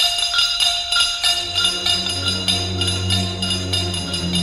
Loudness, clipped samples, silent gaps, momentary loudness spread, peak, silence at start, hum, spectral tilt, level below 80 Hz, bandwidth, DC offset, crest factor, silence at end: -17 LUFS; under 0.1%; none; 5 LU; -2 dBFS; 0 s; none; -2.5 dB/octave; -44 dBFS; 16.5 kHz; under 0.1%; 16 dB; 0 s